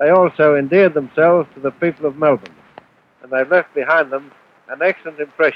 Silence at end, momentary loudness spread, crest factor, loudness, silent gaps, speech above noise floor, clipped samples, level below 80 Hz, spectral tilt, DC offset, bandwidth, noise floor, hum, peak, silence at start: 0 s; 11 LU; 16 dB; -16 LUFS; none; 30 dB; under 0.1%; -66 dBFS; -8.5 dB/octave; under 0.1%; 5.6 kHz; -45 dBFS; none; 0 dBFS; 0 s